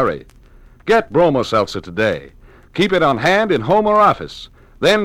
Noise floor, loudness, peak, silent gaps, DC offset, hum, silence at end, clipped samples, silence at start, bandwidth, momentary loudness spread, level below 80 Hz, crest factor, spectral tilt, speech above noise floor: -44 dBFS; -16 LUFS; -2 dBFS; none; under 0.1%; none; 0 s; under 0.1%; 0 s; 15.5 kHz; 15 LU; -44 dBFS; 14 dB; -5.5 dB/octave; 29 dB